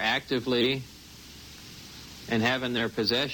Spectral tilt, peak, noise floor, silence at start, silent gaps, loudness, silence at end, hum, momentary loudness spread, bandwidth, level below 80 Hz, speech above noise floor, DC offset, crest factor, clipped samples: -4.5 dB/octave; -10 dBFS; -47 dBFS; 0 s; none; -27 LUFS; 0 s; none; 19 LU; 19 kHz; -56 dBFS; 20 dB; under 0.1%; 20 dB; under 0.1%